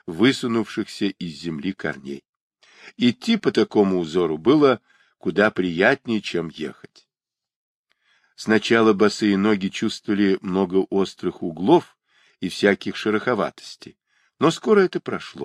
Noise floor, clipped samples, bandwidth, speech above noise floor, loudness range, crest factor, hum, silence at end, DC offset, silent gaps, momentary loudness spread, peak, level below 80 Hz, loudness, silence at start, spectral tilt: -89 dBFS; under 0.1%; 12.5 kHz; 68 dB; 4 LU; 20 dB; none; 0 s; under 0.1%; 2.29-2.51 s, 7.56-7.84 s; 13 LU; -2 dBFS; -62 dBFS; -21 LUFS; 0.05 s; -5.5 dB/octave